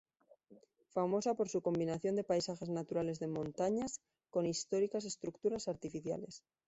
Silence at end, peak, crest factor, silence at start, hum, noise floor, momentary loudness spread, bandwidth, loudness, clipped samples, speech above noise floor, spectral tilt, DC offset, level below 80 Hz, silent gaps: 0.3 s; -22 dBFS; 16 dB; 0.5 s; none; -66 dBFS; 8 LU; 8 kHz; -38 LUFS; under 0.1%; 28 dB; -6 dB/octave; under 0.1%; -72 dBFS; none